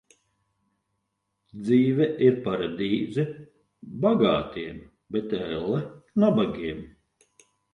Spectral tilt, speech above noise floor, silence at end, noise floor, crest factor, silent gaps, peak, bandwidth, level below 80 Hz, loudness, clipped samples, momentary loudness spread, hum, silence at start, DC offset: -8.5 dB/octave; 54 dB; 0.85 s; -78 dBFS; 20 dB; none; -6 dBFS; 9.8 kHz; -56 dBFS; -25 LUFS; under 0.1%; 15 LU; none; 1.55 s; under 0.1%